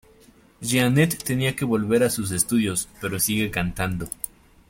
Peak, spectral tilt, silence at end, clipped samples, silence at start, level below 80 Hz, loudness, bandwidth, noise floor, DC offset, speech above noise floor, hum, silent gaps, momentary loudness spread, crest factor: -4 dBFS; -4.5 dB/octave; 0.4 s; under 0.1%; 0.6 s; -46 dBFS; -23 LUFS; 17 kHz; -54 dBFS; under 0.1%; 31 dB; none; none; 10 LU; 20 dB